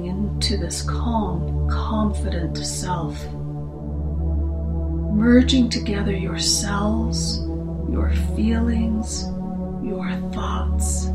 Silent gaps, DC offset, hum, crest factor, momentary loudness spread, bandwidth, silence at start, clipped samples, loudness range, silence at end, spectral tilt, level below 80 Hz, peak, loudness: none; under 0.1%; none; 18 dB; 9 LU; 13 kHz; 0 s; under 0.1%; 5 LU; 0 s; -5 dB/octave; -26 dBFS; -2 dBFS; -22 LUFS